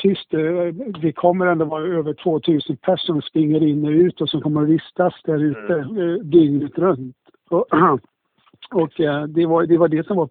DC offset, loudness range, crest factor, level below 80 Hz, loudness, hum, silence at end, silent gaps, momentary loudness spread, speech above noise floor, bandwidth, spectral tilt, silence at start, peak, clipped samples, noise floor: under 0.1%; 2 LU; 16 dB; -60 dBFS; -19 LUFS; none; 0 s; none; 7 LU; 37 dB; 4.5 kHz; -12 dB/octave; 0 s; -2 dBFS; under 0.1%; -55 dBFS